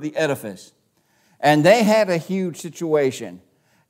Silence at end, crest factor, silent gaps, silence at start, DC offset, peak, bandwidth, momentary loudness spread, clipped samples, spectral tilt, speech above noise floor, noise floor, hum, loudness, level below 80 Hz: 0.55 s; 20 dB; none; 0 s; under 0.1%; 0 dBFS; 16 kHz; 17 LU; under 0.1%; -5.5 dB/octave; 44 dB; -63 dBFS; none; -19 LUFS; -72 dBFS